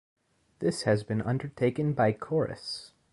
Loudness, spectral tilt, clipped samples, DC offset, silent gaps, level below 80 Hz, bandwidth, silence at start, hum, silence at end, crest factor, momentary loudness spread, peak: -29 LUFS; -6.5 dB/octave; under 0.1%; under 0.1%; none; -60 dBFS; 11.5 kHz; 0.6 s; none; 0.25 s; 18 dB; 9 LU; -12 dBFS